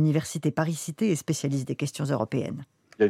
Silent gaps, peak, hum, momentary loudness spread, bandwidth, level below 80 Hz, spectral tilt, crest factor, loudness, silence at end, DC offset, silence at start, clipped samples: none; -10 dBFS; none; 5 LU; 15.5 kHz; -68 dBFS; -6 dB/octave; 18 dB; -28 LUFS; 0 s; under 0.1%; 0 s; under 0.1%